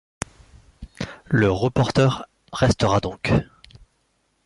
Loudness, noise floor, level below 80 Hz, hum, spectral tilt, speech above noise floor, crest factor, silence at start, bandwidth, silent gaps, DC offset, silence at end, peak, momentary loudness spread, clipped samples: -21 LUFS; -68 dBFS; -42 dBFS; none; -6 dB/octave; 48 dB; 20 dB; 0.8 s; 11.5 kHz; none; under 0.1%; 1 s; -2 dBFS; 16 LU; under 0.1%